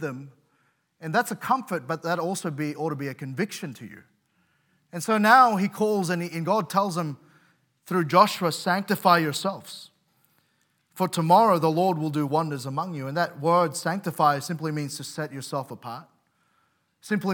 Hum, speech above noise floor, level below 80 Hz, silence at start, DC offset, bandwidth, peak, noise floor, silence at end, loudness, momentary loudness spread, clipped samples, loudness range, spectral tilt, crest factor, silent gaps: none; 45 dB; -82 dBFS; 0 s; under 0.1%; 18 kHz; -2 dBFS; -70 dBFS; 0 s; -24 LUFS; 17 LU; under 0.1%; 6 LU; -5 dB/octave; 22 dB; none